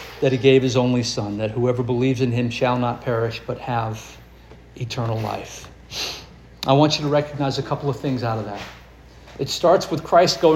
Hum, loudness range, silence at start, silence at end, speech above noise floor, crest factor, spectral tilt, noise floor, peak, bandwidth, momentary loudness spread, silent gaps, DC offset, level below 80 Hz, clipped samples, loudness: none; 7 LU; 0 s; 0 s; 25 dB; 18 dB; -5.5 dB/octave; -45 dBFS; -2 dBFS; 16 kHz; 16 LU; none; under 0.1%; -48 dBFS; under 0.1%; -21 LUFS